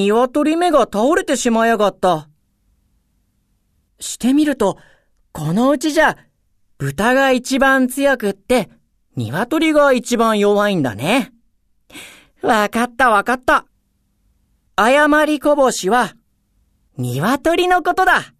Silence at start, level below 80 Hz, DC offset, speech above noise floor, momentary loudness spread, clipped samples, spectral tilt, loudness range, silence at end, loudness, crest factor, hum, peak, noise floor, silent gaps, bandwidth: 0 s; -46 dBFS; under 0.1%; 48 dB; 13 LU; under 0.1%; -4.5 dB/octave; 4 LU; 0.15 s; -16 LUFS; 16 dB; none; 0 dBFS; -63 dBFS; none; 14 kHz